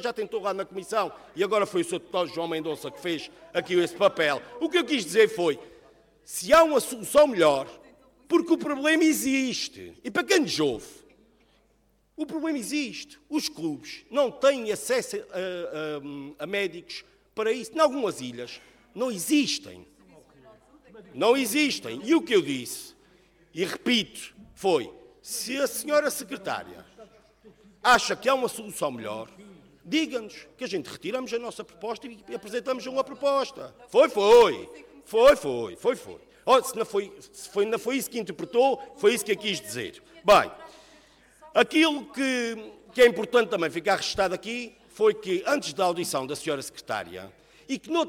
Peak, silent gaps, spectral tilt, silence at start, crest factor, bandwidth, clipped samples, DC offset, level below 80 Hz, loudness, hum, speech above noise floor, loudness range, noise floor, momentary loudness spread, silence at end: -8 dBFS; none; -3 dB/octave; 0 s; 20 dB; 18.5 kHz; under 0.1%; under 0.1%; -60 dBFS; -26 LUFS; none; 41 dB; 8 LU; -66 dBFS; 17 LU; 0 s